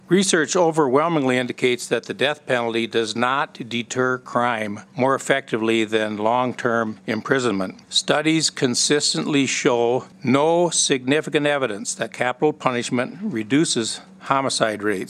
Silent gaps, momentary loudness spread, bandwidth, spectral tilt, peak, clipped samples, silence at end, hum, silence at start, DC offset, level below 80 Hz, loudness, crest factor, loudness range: none; 7 LU; 14 kHz; -3.5 dB/octave; 0 dBFS; under 0.1%; 0 s; none; 0.1 s; under 0.1%; -76 dBFS; -21 LUFS; 20 dB; 3 LU